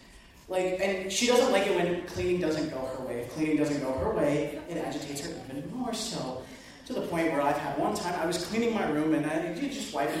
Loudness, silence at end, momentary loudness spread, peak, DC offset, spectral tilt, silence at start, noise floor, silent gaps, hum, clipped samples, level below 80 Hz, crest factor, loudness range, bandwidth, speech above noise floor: -30 LUFS; 0 s; 10 LU; -12 dBFS; under 0.1%; -4.5 dB/octave; 0 s; -52 dBFS; none; none; under 0.1%; -54 dBFS; 18 dB; 5 LU; 16 kHz; 23 dB